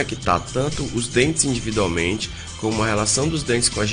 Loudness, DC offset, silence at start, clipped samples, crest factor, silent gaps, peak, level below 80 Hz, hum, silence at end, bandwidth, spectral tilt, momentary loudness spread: -21 LUFS; under 0.1%; 0 s; under 0.1%; 20 dB; none; 0 dBFS; -38 dBFS; none; 0 s; 10.5 kHz; -3.5 dB/octave; 6 LU